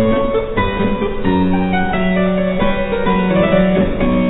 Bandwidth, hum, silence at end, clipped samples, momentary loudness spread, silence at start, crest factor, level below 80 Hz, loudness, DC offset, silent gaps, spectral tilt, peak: 4.1 kHz; none; 0 s; under 0.1%; 4 LU; 0 s; 12 dB; -26 dBFS; -16 LUFS; under 0.1%; none; -11 dB/octave; -2 dBFS